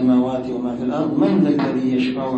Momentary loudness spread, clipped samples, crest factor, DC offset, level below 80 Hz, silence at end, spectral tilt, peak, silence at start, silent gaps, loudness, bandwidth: 7 LU; under 0.1%; 14 dB; under 0.1%; -54 dBFS; 0 s; -8.5 dB/octave; -4 dBFS; 0 s; none; -19 LUFS; 8 kHz